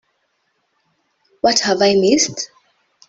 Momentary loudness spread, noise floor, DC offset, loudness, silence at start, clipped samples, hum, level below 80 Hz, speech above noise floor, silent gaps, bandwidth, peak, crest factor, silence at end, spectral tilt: 12 LU; -68 dBFS; under 0.1%; -15 LUFS; 1.45 s; under 0.1%; none; -60 dBFS; 53 dB; none; 8.2 kHz; -2 dBFS; 18 dB; 0.65 s; -3 dB/octave